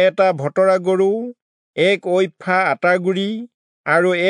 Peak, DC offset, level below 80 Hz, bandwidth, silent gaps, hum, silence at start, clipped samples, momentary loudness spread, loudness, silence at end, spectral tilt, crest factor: -4 dBFS; under 0.1%; -78 dBFS; 10.5 kHz; 1.42-1.74 s, 3.54-3.84 s; none; 0 s; under 0.1%; 11 LU; -17 LUFS; 0 s; -6 dB/octave; 14 dB